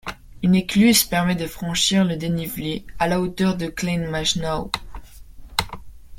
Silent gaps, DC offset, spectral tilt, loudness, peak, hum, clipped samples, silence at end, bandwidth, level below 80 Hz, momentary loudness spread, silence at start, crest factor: none; under 0.1%; -4 dB/octave; -21 LUFS; -2 dBFS; none; under 0.1%; 0 s; 16.5 kHz; -42 dBFS; 13 LU; 0.05 s; 20 dB